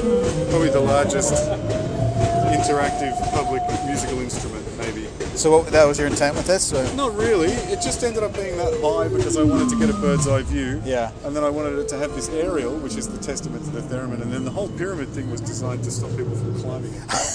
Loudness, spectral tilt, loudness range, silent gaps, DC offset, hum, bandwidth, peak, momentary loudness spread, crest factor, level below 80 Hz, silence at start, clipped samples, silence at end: -22 LUFS; -5 dB/octave; 7 LU; none; under 0.1%; none; 11 kHz; -2 dBFS; 10 LU; 20 dB; -36 dBFS; 0 s; under 0.1%; 0 s